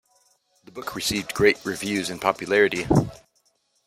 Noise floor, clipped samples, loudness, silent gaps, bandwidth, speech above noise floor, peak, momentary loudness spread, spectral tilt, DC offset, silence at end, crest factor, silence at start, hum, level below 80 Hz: -67 dBFS; under 0.1%; -23 LUFS; none; 16 kHz; 45 dB; -2 dBFS; 14 LU; -4.5 dB/octave; under 0.1%; 0.7 s; 22 dB; 0.75 s; none; -50 dBFS